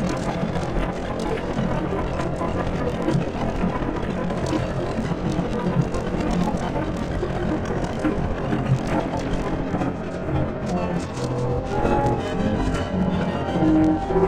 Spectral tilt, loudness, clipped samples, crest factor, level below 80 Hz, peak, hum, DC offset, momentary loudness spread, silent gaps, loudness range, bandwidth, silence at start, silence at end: -7.5 dB/octave; -24 LUFS; under 0.1%; 16 dB; -34 dBFS; -6 dBFS; none; under 0.1%; 5 LU; none; 2 LU; 11 kHz; 0 s; 0 s